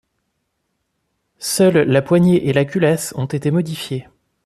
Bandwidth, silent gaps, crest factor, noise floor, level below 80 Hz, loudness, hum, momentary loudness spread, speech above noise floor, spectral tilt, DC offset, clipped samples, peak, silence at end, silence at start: 14 kHz; none; 16 dB; -72 dBFS; -54 dBFS; -17 LUFS; none; 12 LU; 56 dB; -6 dB/octave; under 0.1%; under 0.1%; -2 dBFS; 0.45 s; 1.4 s